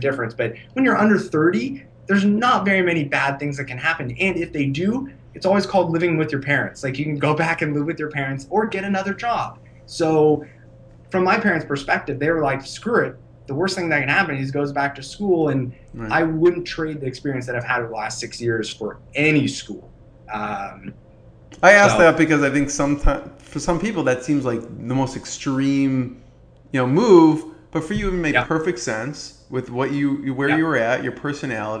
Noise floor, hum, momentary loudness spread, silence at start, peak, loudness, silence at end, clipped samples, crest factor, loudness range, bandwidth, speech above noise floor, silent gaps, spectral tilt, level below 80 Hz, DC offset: -48 dBFS; none; 11 LU; 0 s; 0 dBFS; -20 LUFS; 0 s; under 0.1%; 20 dB; 6 LU; 10.5 kHz; 28 dB; none; -5.5 dB/octave; -38 dBFS; under 0.1%